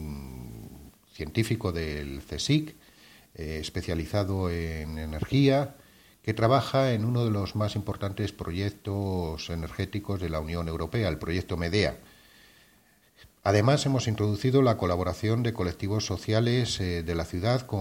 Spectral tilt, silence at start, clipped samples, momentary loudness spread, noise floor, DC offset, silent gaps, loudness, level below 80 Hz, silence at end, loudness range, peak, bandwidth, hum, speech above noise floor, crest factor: -6 dB/octave; 0 s; under 0.1%; 12 LU; -62 dBFS; under 0.1%; none; -28 LUFS; -46 dBFS; 0 s; 5 LU; -8 dBFS; 17 kHz; none; 34 dB; 20 dB